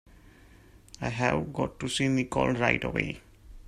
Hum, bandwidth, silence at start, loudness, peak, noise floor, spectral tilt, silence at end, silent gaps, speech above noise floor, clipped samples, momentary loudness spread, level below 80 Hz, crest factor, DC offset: none; 14 kHz; 0.75 s; -28 LUFS; -6 dBFS; -55 dBFS; -5 dB/octave; 0 s; none; 26 dB; under 0.1%; 10 LU; -50 dBFS; 24 dB; under 0.1%